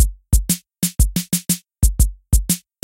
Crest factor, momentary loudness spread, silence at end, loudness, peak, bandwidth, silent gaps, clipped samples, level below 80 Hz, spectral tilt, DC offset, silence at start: 16 dB; 4 LU; 0.25 s; -20 LUFS; -2 dBFS; 17 kHz; none; under 0.1%; -20 dBFS; -4 dB/octave; under 0.1%; 0 s